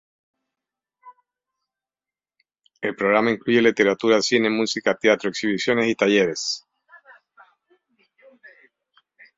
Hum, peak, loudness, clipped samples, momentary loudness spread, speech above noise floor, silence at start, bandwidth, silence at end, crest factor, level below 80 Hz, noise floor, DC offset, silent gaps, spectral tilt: none; -2 dBFS; -20 LUFS; under 0.1%; 8 LU; over 70 dB; 1.05 s; 7.8 kHz; 2.8 s; 22 dB; -66 dBFS; under -90 dBFS; under 0.1%; none; -4 dB/octave